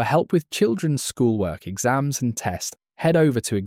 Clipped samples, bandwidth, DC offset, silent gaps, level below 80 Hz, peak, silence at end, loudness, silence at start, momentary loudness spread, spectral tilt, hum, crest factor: under 0.1%; 16.5 kHz; under 0.1%; none; -52 dBFS; -6 dBFS; 0 s; -22 LUFS; 0 s; 8 LU; -5.5 dB/octave; none; 16 dB